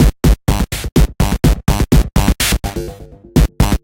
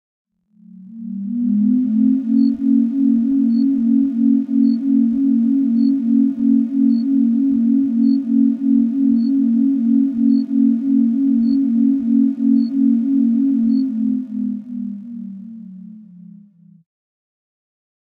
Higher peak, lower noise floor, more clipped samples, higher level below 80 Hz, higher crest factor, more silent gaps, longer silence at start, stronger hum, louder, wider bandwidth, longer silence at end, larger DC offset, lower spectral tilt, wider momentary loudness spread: first, 0 dBFS vs -6 dBFS; second, -33 dBFS vs -46 dBFS; neither; first, -16 dBFS vs -64 dBFS; about the same, 12 dB vs 10 dB; neither; second, 0 s vs 0.8 s; neither; about the same, -15 LUFS vs -16 LUFS; first, 17 kHz vs 4.7 kHz; second, 0.05 s vs 2 s; neither; second, -5.5 dB/octave vs -10.5 dB/octave; second, 6 LU vs 9 LU